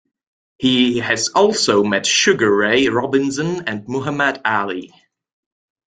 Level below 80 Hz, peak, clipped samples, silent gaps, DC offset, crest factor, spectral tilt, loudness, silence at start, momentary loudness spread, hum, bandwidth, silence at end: -58 dBFS; -2 dBFS; under 0.1%; none; under 0.1%; 16 dB; -3.5 dB/octave; -16 LUFS; 0.6 s; 9 LU; none; 9.6 kHz; 1.1 s